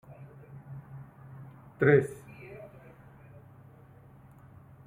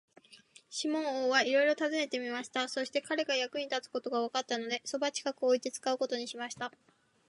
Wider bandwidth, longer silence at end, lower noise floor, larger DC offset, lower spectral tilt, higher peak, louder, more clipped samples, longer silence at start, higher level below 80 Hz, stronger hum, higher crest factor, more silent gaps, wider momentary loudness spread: first, 15 kHz vs 11.5 kHz; first, 2.3 s vs 0.6 s; second, -54 dBFS vs -60 dBFS; neither; first, -8.5 dB/octave vs -1.5 dB/octave; first, -10 dBFS vs -14 dBFS; first, -26 LUFS vs -33 LUFS; neither; first, 0.7 s vs 0.3 s; first, -64 dBFS vs -86 dBFS; neither; first, 26 dB vs 20 dB; neither; first, 29 LU vs 9 LU